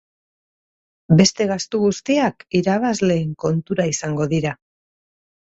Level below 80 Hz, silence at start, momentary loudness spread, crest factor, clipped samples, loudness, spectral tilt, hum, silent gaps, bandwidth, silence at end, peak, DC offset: -54 dBFS; 1.1 s; 8 LU; 20 dB; under 0.1%; -19 LUFS; -5.5 dB/octave; none; none; 8 kHz; 0.9 s; 0 dBFS; under 0.1%